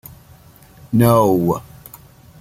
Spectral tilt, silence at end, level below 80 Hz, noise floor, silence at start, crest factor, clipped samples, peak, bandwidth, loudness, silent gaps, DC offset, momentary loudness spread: -7.5 dB/octave; 0.8 s; -48 dBFS; -45 dBFS; 0.9 s; 18 dB; under 0.1%; -2 dBFS; 16 kHz; -16 LUFS; none; under 0.1%; 13 LU